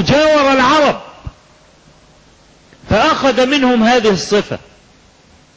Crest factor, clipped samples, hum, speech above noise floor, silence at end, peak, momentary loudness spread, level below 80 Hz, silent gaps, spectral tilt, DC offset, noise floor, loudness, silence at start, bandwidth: 10 dB; under 0.1%; none; 35 dB; 1 s; -4 dBFS; 15 LU; -40 dBFS; none; -4.5 dB/octave; under 0.1%; -47 dBFS; -12 LUFS; 0 s; 8 kHz